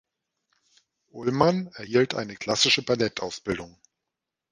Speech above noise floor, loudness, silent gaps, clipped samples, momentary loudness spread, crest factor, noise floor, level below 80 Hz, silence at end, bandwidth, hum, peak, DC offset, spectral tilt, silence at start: 61 dB; -25 LUFS; none; under 0.1%; 12 LU; 24 dB; -86 dBFS; -60 dBFS; 0.85 s; 11 kHz; none; -4 dBFS; under 0.1%; -4 dB/octave; 1.15 s